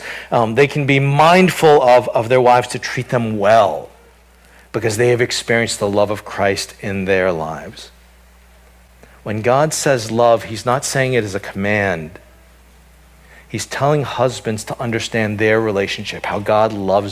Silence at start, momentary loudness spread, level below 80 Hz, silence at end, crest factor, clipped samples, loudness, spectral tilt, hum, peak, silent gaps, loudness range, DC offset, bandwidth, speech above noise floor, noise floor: 0 s; 13 LU; -46 dBFS; 0 s; 16 dB; under 0.1%; -16 LUFS; -5 dB/octave; none; 0 dBFS; none; 8 LU; under 0.1%; 16 kHz; 32 dB; -47 dBFS